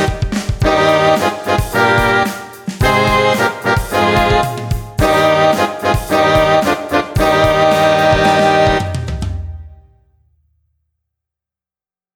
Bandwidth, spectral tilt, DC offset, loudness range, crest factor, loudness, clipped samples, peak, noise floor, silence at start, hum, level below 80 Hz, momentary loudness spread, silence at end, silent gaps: 19 kHz; -5 dB/octave; under 0.1%; 5 LU; 14 dB; -13 LUFS; under 0.1%; 0 dBFS; under -90 dBFS; 0 s; none; -28 dBFS; 10 LU; 2.4 s; none